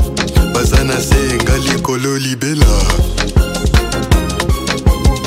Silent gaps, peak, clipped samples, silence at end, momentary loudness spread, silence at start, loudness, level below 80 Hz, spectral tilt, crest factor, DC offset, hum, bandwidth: none; 0 dBFS; under 0.1%; 0 s; 4 LU; 0 s; -14 LUFS; -16 dBFS; -5 dB/octave; 12 dB; under 0.1%; none; 16.5 kHz